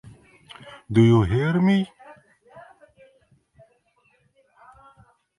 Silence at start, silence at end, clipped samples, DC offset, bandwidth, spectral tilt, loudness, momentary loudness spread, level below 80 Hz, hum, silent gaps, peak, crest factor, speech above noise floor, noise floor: 0.65 s; 2.8 s; under 0.1%; under 0.1%; 11 kHz; -8.5 dB/octave; -20 LUFS; 26 LU; -48 dBFS; none; none; -4 dBFS; 20 dB; 46 dB; -65 dBFS